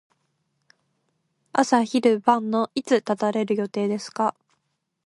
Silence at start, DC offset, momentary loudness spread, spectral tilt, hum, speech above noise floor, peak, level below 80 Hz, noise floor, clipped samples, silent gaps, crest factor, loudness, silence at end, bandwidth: 1.55 s; under 0.1%; 7 LU; -5 dB/octave; none; 54 dB; -2 dBFS; -74 dBFS; -76 dBFS; under 0.1%; none; 22 dB; -23 LUFS; 0.75 s; 11.5 kHz